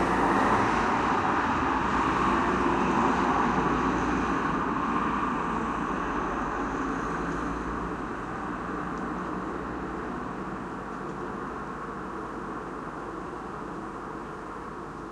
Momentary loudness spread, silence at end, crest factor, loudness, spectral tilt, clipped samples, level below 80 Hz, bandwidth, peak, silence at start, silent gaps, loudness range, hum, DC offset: 12 LU; 0 s; 18 dB; -29 LUFS; -6 dB/octave; under 0.1%; -44 dBFS; 11 kHz; -12 dBFS; 0 s; none; 11 LU; none; under 0.1%